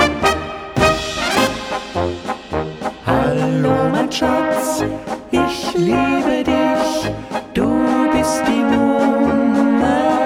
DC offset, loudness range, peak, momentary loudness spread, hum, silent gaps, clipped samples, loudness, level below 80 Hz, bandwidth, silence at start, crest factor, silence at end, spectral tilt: under 0.1%; 2 LU; 0 dBFS; 8 LU; none; none; under 0.1%; -17 LUFS; -38 dBFS; 16.5 kHz; 0 s; 16 dB; 0 s; -5 dB/octave